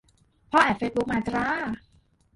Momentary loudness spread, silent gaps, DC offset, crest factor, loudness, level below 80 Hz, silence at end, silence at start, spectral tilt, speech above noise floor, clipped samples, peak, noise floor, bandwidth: 11 LU; none; under 0.1%; 22 dB; -25 LUFS; -52 dBFS; 0.6 s; 0.5 s; -5.5 dB/octave; 37 dB; under 0.1%; -6 dBFS; -62 dBFS; 11.5 kHz